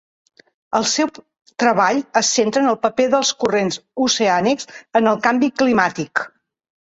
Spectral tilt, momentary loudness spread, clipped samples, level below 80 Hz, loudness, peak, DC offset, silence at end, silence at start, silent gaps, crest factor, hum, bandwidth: -3 dB/octave; 8 LU; under 0.1%; -60 dBFS; -18 LUFS; -2 dBFS; under 0.1%; 0.55 s; 0.7 s; none; 16 dB; none; 8.2 kHz